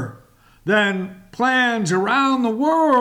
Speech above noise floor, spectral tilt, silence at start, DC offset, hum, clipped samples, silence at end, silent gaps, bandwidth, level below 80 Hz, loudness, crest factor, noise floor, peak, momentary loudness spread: 33 dB; -5 dB/octave; 0 s; under 0.1%; none; under 0.1%; 0 s; none; 14 kHz; -60 dBFS; -18 LUFS; 14 dB; -51 dBFS; -6 dBFS; 13 LU